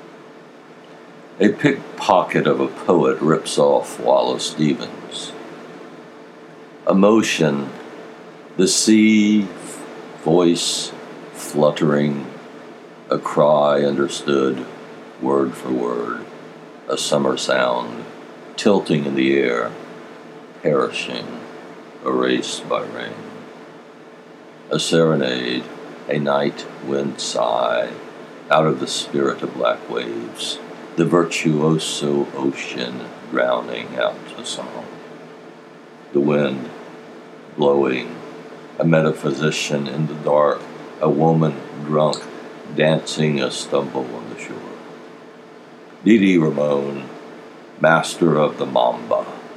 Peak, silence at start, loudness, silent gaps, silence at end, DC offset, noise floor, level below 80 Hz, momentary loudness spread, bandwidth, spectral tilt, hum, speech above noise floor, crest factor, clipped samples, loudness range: 0 dBFS; 0 s; -19 LUFS; none; 0 s; under 0.1%; -42 dBFS; -70 dBFS; 21 LU; 14.5 kHz; -5 dB/octave; none; 24 dB; 20 dB; under 0.1%; 6 LU